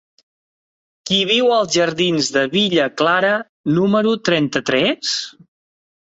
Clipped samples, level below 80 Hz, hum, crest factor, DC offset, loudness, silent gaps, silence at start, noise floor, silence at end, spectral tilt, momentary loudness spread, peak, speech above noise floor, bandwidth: under 0.1%; -58 dBFS; none; 16 dB; under 0.1%; -17 LUFS; 3.49-3.64 s; 1.05 s; under -90 dBFS; 0.75 s; -4 dB/octave; 6 LU; -2 dBFS; over 73 dB; 8 kHz